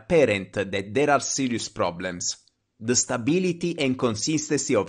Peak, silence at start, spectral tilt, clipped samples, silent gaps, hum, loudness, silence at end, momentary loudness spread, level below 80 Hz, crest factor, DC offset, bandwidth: -8 dBFS; 0.1 s; -4 dB/octave; under 0.1%; none; none; -24 LUFS; 0 s; 7 LU; -56 dBFS; 18 dB; under 0.1%; 10 kHz